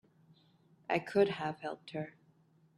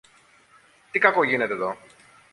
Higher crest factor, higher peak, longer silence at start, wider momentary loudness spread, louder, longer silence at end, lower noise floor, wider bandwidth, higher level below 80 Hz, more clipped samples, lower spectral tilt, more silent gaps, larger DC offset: about the same, 22 dB vs 24 dB; second, -16 dBFS vs -2 dBFS; about the same, 0.9 s vs 0.95 s; first, 15 LU vs 12 LU; second, -35 LUFS vs -22 LUFS; about the same, 0.65 s vs 0.55 s; first, -68 dBFS vs -57 dBFS; about the same, 11.5 kHz vs 11.5 kHz; about the same, -76 dBFS vs -72 dBFS; neither; about the same, -6.5 dB/octave vs -5.5 dB/octave; neither; neither